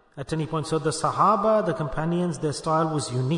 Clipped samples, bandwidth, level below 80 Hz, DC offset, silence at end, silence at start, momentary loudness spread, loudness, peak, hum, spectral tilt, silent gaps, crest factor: under 0.1%; 11 kHz; -50 dBFS; under 0.1%; 0 s; 0.15 s; 8 LU; -24 LUFS; -6 dBFS; none; -6 dB/octave; none; 18 dB